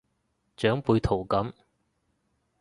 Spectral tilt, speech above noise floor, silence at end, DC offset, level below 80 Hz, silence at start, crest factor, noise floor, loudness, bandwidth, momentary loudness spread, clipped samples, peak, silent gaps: -7.5 dB/octave; 49 dB; 1.1 s; under 0.1%; -46 dBFS; 0.6 s; 20 dB; -75 dBFS; -27 LUFS; 11.5 kHz; 5 LU; under 0.1%; -8 dBFS; none